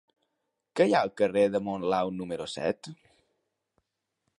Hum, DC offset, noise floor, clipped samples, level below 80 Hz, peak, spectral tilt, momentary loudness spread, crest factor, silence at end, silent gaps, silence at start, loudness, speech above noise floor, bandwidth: none; under 0.1%; -82 dBFS; under 0.1%; -68 dBFS; -10 dBFS; -5.5 dB/octave; 12 LU; 20 dB; 1.45 s; none; 0.75 s; -28 LUFS; 54 dB; 11.5 kHz